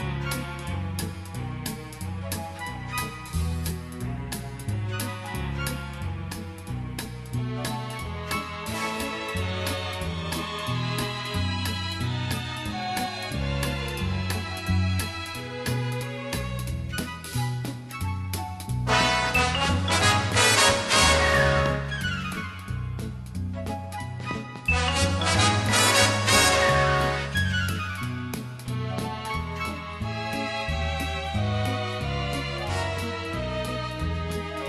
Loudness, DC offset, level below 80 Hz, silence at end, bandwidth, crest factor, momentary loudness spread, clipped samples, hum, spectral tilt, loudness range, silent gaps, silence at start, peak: -26 LUFS; under 0.1%; -40 dBFS; 0 s; 13 kHz; 22 dB; 14 LU; under 0.1%; none; -3.5 dB/octave; 11 LU; none; 0 s; -4 dBFS